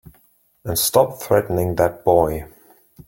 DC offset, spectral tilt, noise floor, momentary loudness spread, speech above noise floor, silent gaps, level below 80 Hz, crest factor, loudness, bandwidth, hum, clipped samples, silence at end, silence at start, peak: under 0.1%; -4.5 dB/octave; -58 dBFS; 8 LU; 40 dB; none; -44 dBFS; 18 dB; -19 LUFS; 17 kHz; none; under 0.1%; 0.6 s; 0.65 s; -2 dBFS